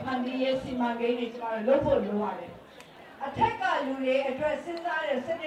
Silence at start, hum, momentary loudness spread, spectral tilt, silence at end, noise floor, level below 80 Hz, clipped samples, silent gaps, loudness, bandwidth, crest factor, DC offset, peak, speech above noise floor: 0 s; none; 15 LU; -6 dB/octave; 0 s; -49 dBFS; -56 dBFS; under 0.1%; none; -29 LUFS; 11 kHz; 18 dB; under 0.1%; -12 dBFS; 21 dB